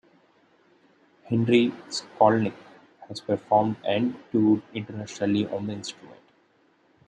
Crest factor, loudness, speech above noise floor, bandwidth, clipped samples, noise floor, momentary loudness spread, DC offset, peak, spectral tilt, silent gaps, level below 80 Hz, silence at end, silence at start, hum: 22 dB; -25 LUFS; 39 dB; 9.4 kHz; under 0.1%; -63 dBFS; 15 LU; under 0.1%; -4 dBFS; -6 dB/octave; none; -70 dBFS; 0.95 s; 1.3 s; none